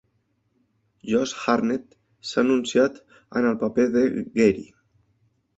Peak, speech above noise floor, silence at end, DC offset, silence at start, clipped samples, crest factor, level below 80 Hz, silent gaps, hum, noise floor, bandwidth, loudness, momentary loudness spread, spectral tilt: -4 dBFS; 48 dB; 0.95 s; under 0.1%; 1.05 s; under 0.1%; 20 dB; -60 dBFS; none; none; -70 dBFS; 8 kHz; -23 LUFS; 10 LU; -5 dB/octave